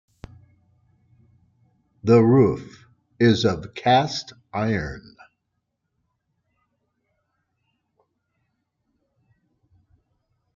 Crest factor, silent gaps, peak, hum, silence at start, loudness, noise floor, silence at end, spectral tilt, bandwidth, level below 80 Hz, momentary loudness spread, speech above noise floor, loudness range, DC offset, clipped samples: 20 dB; none; -4 dBFS; none; 2.05 s; -20 LUFS; -77 dBFS; 5.55 s; -6.5 dB/octave; 7.4 kHz; -54 dBFS; 17 LU; 57 dB; 13 LU; under 0.1%; under 0.1%